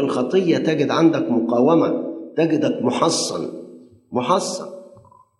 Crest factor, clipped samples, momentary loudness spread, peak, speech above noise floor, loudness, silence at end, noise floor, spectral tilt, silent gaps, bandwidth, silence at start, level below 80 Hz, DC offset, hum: 18 dB; under 0.1%; 12 LU; -2 dBFS; 30 dB; -19 LUFS; 0.5 s; -49 dBFS; -5 dB/octave; none; 12 kHz; 0 s; -70 dBFS; under 0.1%; none